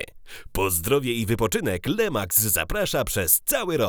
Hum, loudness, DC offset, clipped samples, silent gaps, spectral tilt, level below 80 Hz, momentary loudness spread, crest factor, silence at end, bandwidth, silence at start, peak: none; -22 LUFS; under 0.1%; under 0.1%; none; -3.5 dB/octave; -40 dBFS; 6 LU; 20 dB; 0 s; over 20 kHz; 0 s; -4 dBFS